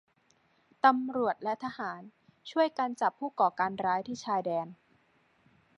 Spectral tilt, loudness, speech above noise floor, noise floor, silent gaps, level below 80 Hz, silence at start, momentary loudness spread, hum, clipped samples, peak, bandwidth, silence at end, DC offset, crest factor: -5 dB/octave; -31 LUFS; 39 dB; -69 dBFS; none; -78 dBFS; 0.85 s; 13 LU; none; under 0.1%; -10 dBFS; 10.5 kHz; 1.05 s; under 0.1%; 24 dB